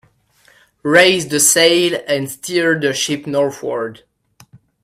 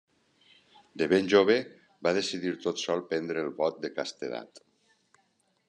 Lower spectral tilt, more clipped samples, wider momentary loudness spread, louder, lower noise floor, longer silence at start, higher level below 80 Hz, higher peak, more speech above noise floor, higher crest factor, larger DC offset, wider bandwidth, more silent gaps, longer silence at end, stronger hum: second, -2.5 dB/octave vs -4.5 dB/octave; neither; second, 12 LU vs 15 LU; first, -14 LUFS vs -29 LUFS; second, -54 dBFS vs -71 dBFS; about the same, 0.85 s vs 0.95 s; first, -60 dBFS vs -76 dBFS; first, 0 dBFS vs -8 dBFS; second, 38 dB vs 43 dB; second, 16 dB vs 22 dB; neither; first, 16 kHz vs 10.5 kHz; neither; second, 0.9 s vs 1.1 s; neither